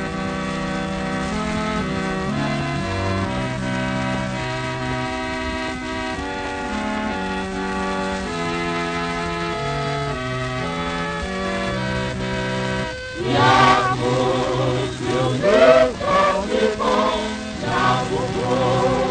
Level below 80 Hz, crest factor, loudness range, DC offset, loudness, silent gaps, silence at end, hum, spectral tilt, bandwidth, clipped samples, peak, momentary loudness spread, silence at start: -38 dBFS; 20 dB; 7 LU; under 0.1%; -21 LUFS; none; 0 s; none; -5.5 dB/octave; 9.6 kHz; under 0.1%; 0 dBFS; 9 LU; 0 s